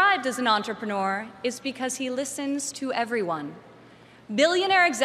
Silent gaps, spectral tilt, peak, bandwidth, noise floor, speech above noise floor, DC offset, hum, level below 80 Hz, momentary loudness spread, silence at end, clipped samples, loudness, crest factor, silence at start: none; -2.5 dB/octave; -8 dBFS; 14 kHz; -51 dBFS; 25 dB; under 0.1%; none; -72 dBFS; 10 LU; 0 s; under 0.1%; -26 LUFS; 18 dB; 0 s